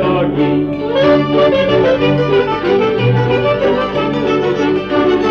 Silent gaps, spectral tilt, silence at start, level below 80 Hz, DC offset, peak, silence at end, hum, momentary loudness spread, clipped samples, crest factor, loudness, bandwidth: none; -7.5 dB/octave; 0 s; -38 dBFS; under 0.1%; -2 dBFS; 0 s; 50 Hz at -35 dBFS; 4 LU; under 0.1%; 10 dB; -13 LUFS; 7 kHz